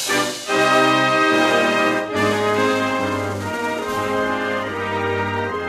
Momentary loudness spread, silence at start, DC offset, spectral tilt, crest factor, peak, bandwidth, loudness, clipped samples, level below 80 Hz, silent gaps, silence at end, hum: 8 LU; 0 s; under 0.1%; -4 dB/octave; 16 dB; -4 dBFS; 15 kHz; -19 LUFS; under 0.1%; -56 dBFS; none; 0 s; none